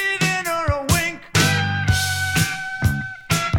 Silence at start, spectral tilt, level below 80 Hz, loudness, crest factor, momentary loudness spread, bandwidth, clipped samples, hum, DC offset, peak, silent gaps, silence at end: 0 s; -3.5 dB/octave; -36 dBFS; -20 LUFS; 16 dB; 5 LU; 18 kHz; under 0.1%; none; under 0.1%; -4 dBFS; none; 0 s